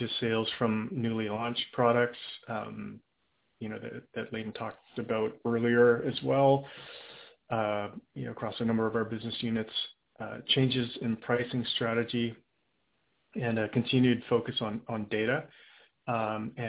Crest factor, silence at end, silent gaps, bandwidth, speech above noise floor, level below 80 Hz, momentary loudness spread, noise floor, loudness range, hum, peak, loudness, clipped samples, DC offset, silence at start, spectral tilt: 20 dB; 0 s; none; 4 kHz; 46 dB; -66 dBFS; 15 LU; -77 dBFS; 5 LU; none; -12 dBFS; -30 LUFS; under 0.1%; under 0.1%; 0 s; -4 dB/octave